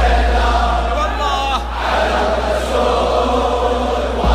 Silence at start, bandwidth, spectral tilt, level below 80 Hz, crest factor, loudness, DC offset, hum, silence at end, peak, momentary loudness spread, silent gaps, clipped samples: 0 s; 13 kHz; -5.5 dB/octave; -20 dBFS; 12 dB; -16 LUFS; under 0.1%; none; 0 s; -2 dBFS; 3 LU; none; under 0.1%